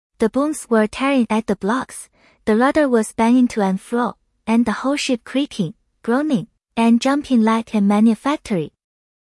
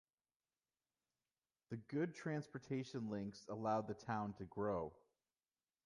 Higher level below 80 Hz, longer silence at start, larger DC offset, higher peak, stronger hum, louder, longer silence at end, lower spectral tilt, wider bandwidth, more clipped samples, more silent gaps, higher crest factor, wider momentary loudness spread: first, -52 dBFS vs -74 dBFS; second, 0.2 s vs 1.7 s; neither; first, -4 dBFS vs -28 dBFS; neither; first, -18 LUFS vs -45 LUFS; second, 0.55 s vs 0.9 s; second, -5.5 dB/octave vs -7 dB/octave; about the same, 12 kHz vs 11 kHz; neither; neither; second, 14 dB vs 20 dB; first, 10 LU vs 7 LU